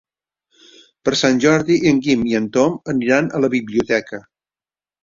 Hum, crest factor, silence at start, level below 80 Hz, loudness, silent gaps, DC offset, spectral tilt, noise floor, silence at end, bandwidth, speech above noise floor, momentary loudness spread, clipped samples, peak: none; 16 dB; 1.05 s; -54 dBFS; -17 LUFS; none; under 0.1%; -5 dB/octave; under -90 dBFS; 0.85 s; 7.6 kHz; over 74 dB; 6 LU; under 0.1%; -2 dBFS